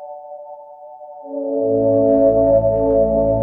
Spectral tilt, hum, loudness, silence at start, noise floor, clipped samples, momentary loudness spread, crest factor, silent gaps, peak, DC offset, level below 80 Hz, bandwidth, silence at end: -14 dB/octave; none; -16 LUFS; 0 s; -37 dBFS; under 0.1%; 23 LU; 14 dB; none; -4 dBFS; under 0.1%; -38 dBFS; 2.1 kHz; 0 s